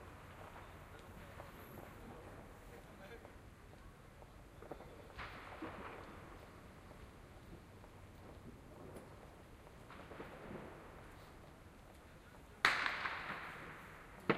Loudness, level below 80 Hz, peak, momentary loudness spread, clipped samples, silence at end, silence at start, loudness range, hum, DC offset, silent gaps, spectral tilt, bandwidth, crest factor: -47 LUFS; -64 dBFS; -10 dBFS; 16 LU; under 0.1%; 0 s; 0 s; 15 LU; none; under 0.1%; none; -4 dB/octave; 15.5 kHz; 38 dB